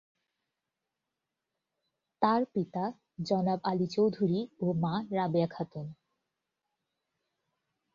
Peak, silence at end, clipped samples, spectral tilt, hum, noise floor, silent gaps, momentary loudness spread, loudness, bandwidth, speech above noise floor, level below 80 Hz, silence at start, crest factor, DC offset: -12 dBFS; 2 s; under 0.1%; -8 dB/octave; none; -88 dBFS; none; 11 LU; -31 LUFS; 7.4 kHz; 57 dB; -72 dBFS; 2.2 s; 22 dB; under 0.1%